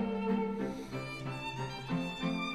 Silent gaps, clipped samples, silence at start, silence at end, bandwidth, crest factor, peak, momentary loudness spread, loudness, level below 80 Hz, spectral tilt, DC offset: none; under 0.1%; 0 s; 0 s; 14 kHz; 14 dB; -22 dBFS; 7 LU; -37 LUFS; -58 dBFS; -6.5 dB/octave; 0.1%